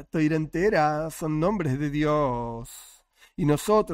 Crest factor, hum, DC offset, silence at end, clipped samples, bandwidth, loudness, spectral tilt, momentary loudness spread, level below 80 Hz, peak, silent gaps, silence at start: 16 dB; none; under 0.1%; 0 s; under 0.1%; 16 kHz; -25 LUFS; -6.5 dB/octave; 15 LU; -48 dBFS; -10 dBFS; none; 0 s